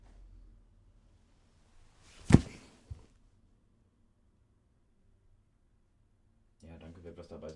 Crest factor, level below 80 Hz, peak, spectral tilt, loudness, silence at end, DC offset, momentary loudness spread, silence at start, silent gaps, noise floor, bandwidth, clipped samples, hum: 34 dB; -50 dBFS; -4 dBFS; -7.5 dB/octave; -26 LUFS; 0.05 s; under 0.1%; 29 LU; 2.3 s; none; -69 dBFS; 11.5 kHz; under 0.1%; none